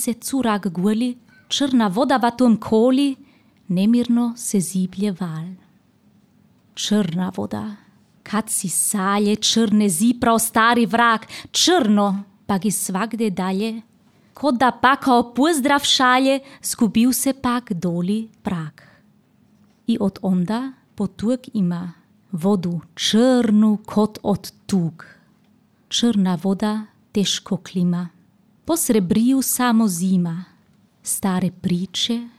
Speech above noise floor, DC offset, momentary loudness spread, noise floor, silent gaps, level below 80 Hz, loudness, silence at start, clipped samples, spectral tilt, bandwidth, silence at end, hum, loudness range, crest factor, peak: 38 dB; under 0.1%; 12 LU; -57 dBFS; none; -58 dBFS; -19 LUFS; 0 s; under 0.1%; -4 dB/octave; 16 kHz; 0.1 s; none; 7 LU; 18 dB; -4 dBFS